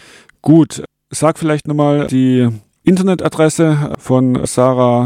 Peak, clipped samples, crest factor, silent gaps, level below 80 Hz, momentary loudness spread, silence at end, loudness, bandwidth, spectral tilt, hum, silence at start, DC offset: 0 dBFS; under 0.1%; 12 dB; none; -46 dBFS; 7 LU; 0 s; -13 LUFS; 15 kHz; -6.5 dB/octave; none; 0.45 s; under 0.1%